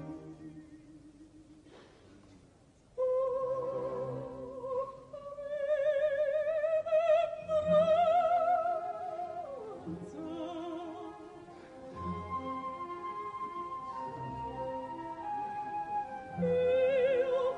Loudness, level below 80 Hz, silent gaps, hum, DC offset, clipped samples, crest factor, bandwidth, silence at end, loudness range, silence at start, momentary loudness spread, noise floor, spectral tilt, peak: -33 LUFS; -66 dBFS; none; none; under 0.1%; under 0.1%; 16 dB; 9.8 kHz; 0 s; 12 LU; 0 s; 18 LU; -62 dBFS; -7 dB/octave; -18 dBFS